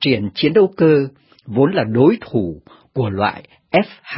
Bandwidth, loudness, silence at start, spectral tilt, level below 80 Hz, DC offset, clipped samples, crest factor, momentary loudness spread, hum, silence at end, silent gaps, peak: 5.8 kHz; -17 LUFS; 0 s; -12 dB/octave; -48 dBFS; under 0.1%; under 0.1%; 16 dB; 13 LU; none; 0 s; none; 0 dBFS